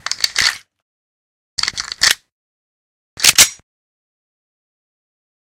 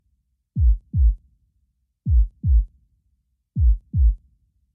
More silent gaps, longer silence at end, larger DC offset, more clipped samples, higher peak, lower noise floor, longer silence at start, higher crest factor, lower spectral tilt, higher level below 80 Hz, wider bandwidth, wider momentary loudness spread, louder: first, 0.82-1.57 s, 2.32-3.17 s vs none; first, 2.05 s vs 0.6 s; neither; first, 0.1% vs under 0.1%; first, 0 dBFS vs -8 dBFS; first, under -90 dBFS vs -69 dBFS; second, 0.05 s vs 0.55 s; first, 20 dB vs 12 dB; second, 2 dB/octave vs -14.5 dB/octave; second, -52 dBFS vs -22 dBFS; first, over 20 kHz vs 0.4 kHz; about the same, 12 LU vs 12 LU; first, -13 LUFS vs -23 LUFS